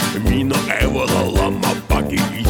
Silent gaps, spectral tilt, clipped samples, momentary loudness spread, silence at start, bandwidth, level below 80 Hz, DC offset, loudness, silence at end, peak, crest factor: none; -5 dB/octave; under 0.1%; 3 LU; 0 s; over 20 kHz; -26 dBFS; under 0.1%; -18 LUFS; 0 s; -4 dBFS; 14 dB